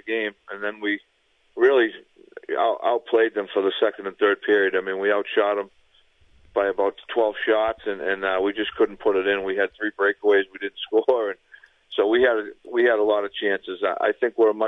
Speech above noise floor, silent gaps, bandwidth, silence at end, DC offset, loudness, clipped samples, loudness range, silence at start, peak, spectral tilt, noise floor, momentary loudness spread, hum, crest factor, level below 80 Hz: 36 dB; none; 4 kHz; 0 s; under 0.1%; -23 LUFS; under 0.1%; 2 LU; 0.05 s; -6 dBFS; -6 dB/octave; -59 dBFS; 10 LU; none; 18 dB; -62 dBFS